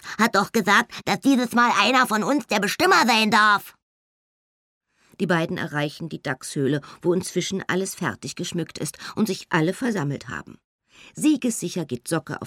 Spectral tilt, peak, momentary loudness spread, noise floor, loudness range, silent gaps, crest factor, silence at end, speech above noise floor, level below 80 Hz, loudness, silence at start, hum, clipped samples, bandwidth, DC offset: -4 dB/octave; -4 dBFS; 12 LU; under -90 dBFS; 8 LU; 3.82-4.81 s, 10.64-10.79 s; 20 dB; 0 s; over 68 dB; -64 dBFS; -22 LUFS; 0.05 s; none; under 0.1%; 17 kHz; under 0.1%